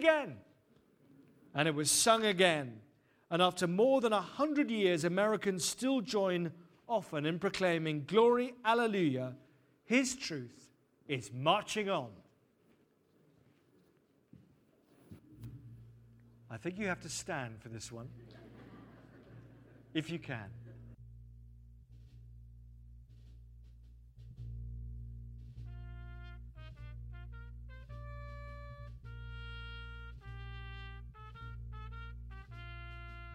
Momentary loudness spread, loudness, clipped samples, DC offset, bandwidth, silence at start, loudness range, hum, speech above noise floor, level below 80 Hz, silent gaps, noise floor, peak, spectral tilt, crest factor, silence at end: 25 LU; -33 LUFS; under 0.1%; under 0.1%; 16 kHz; 0 s; 19 LU; none; 38 dB; -54 dBFS; none; -71 dBFS; -12 dBFS; -4 dB/octave; 24 dB; 0 s